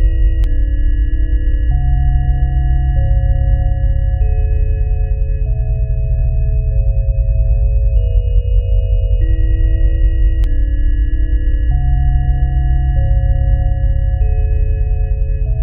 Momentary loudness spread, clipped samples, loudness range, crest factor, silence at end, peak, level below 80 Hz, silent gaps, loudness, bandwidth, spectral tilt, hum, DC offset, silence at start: 3 LU; under 0.1%; 1 LU; 10 dB; 0 s; -2 dBFS; -12 dBFS; none; -17 LUFS; 3.1 kHz; -10.5 dB/octave; none; under 0.1%; 0 s